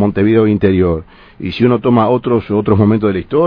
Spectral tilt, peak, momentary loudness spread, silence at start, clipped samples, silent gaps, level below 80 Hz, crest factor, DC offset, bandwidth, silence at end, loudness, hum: -10.5 dB/octave; 0 dBFS; 6 LU; 0 s; under 0.1%; none; -38 dBFS; 12 dB; under 0.1%; 5.2 kHz; 0 s; -13 LUFS; none